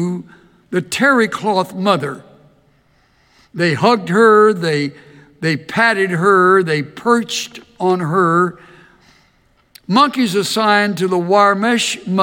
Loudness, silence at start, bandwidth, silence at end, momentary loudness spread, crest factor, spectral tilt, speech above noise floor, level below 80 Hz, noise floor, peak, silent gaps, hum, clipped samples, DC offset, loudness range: -15 LUFS; 0 s; 17.5 kHz; 0 s; 11 LU; 16 dB; -5 dB/octave; 42 dB; -62 dBFS; -56 dBFS; 0 dBFS; none; none; under 0.1%; under 0.1%; 5 LU